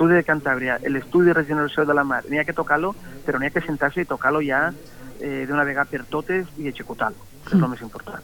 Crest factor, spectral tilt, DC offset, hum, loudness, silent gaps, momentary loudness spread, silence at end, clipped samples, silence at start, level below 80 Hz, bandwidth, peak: 18 dB; -7 dB/octave; under 0.1%; none; -22 LUFS; none; 13 LU; 0 s; under 0.1%; 0 s; -50 dBFS; 19 kHz; -6 dBFS